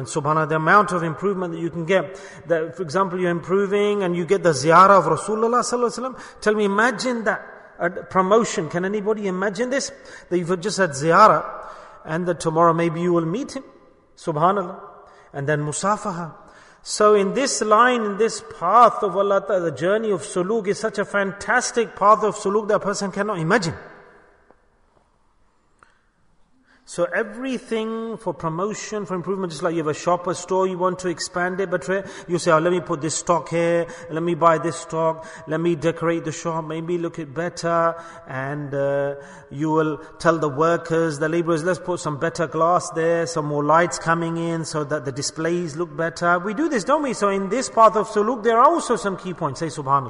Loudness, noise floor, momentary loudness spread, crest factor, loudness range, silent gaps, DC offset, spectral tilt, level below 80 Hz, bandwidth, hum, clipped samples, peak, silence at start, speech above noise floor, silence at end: -21 LUFS; -60 dBFS; 12 LU; 20 dB; 7 LU; none; under 0.1%; -5 dB/octave; -58 dBFS; 11 kHz; none; under 0.1%; -2 dBFS; 0 s; 39 dB; 0 s